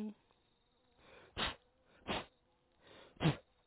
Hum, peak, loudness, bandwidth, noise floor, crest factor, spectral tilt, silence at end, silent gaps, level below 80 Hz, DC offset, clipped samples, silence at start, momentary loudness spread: none; -20 dBFS; -41 LUFS; 4 kHz; -76 dBFS; 24 dB; -4 dB/octave; 0.25 s; none; -62 dBFS; under 0.1%; under 0.1%; 0 s; 23 LU